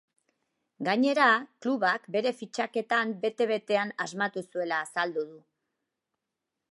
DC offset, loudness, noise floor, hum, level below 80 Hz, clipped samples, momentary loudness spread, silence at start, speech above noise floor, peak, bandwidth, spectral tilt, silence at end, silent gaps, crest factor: under 0.1%; -28 LUFS; -86 dBFS; none; -86 dBFS; under 0.1%; 10 LU; 0.8 s; 58 dB; -8 dBFS; 11.5 kHz; -4 dB/octave; 1.35 s; none; 22 dB